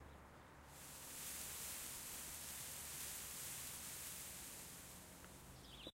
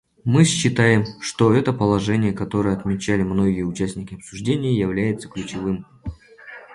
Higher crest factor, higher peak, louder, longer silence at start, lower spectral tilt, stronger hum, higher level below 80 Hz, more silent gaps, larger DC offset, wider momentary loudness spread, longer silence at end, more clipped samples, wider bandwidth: about the same, 20 dB vs 18 dB; second, -32 dBFS vs -2 dBFS; second, -49 LUFS vs -20 LUFS; second, 0 s vs 0.25 s; second, -1 dB/octave vs -6 dB/octave; neither; second, -68 dBFS vs -44 dBFS; neither; neither; second, 11 LU vs 16 LU; about the same, 0.05 s vs 0 s; neither; first, 16 kHz vs 11.5 kHz